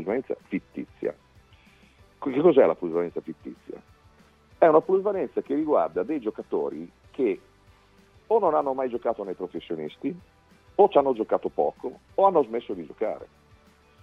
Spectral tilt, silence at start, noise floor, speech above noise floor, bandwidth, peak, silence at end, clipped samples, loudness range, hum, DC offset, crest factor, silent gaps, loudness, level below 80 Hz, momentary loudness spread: -8.5 dB/octave; 0 s; -57 dBFS; 32 dB; 6 kHz; -4 dBFS; 0.75 s; under 0.1%; 4 LU; none; under 0.1%; 22 dB; none; -25 LUFS; -64 dBFS; 19 LU